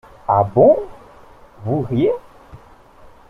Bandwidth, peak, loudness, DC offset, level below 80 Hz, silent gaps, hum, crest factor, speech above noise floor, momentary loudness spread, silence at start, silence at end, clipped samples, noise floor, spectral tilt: 5.4 kHz; -2 dBFS; -17 LUFS; under 0.1%; -48 dBFS; none; none; 18 dB; 30 dB; 17 LU; 0.3 s; 0.75 s; under 0.1%; -45 dBFS; -10 dB/octave